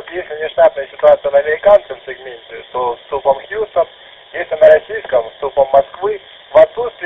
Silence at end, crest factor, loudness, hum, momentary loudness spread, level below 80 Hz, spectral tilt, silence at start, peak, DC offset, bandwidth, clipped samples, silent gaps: 0 s; 14 dB; -14 LUFS; none; 17 LU; -48 dBFS; -6 dB/octave; 0.05 s; 0 dBFS; under 0.1%; 4 kHz; under 0.1%; none